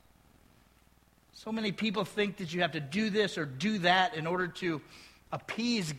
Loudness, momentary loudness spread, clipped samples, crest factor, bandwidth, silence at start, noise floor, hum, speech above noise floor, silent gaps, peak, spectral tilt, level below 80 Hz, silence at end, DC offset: -32 LUFS; 13 LU; under 0.1%; 22 dB; 15 kHz; 1.35 s; -65 dBFS; none; 33 dB; none; -12 dBFS; -4.5 dB/octave; -66 dBFS; 0 s; under 0.1%